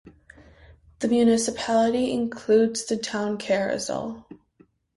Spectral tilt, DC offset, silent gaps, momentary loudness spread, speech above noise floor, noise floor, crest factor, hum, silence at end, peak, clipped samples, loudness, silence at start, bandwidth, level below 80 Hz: -4 dB/octave; under 0.1%; none; 10 LU; 37 dB; -60 dBFS; 16 dB; none; 0.6 s; -8 dBFS; under 0.1%; -24 LUFS; 0.05 s; 11.5 kHz; -58 dBFS